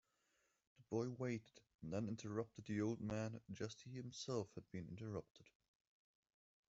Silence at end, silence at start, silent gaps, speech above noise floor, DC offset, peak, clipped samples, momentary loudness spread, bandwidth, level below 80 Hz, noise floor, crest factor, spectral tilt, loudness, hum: 1.25 s; 0.8 s; 5.30-5.35 s; 37 dB; under 0.1%; -30 dBFS; under 0.1%; 9 LU; 8 kHz; -78 dBFS; -84 dBFS; 20 dB; -6.5 dB/octave; -48 LUFS; none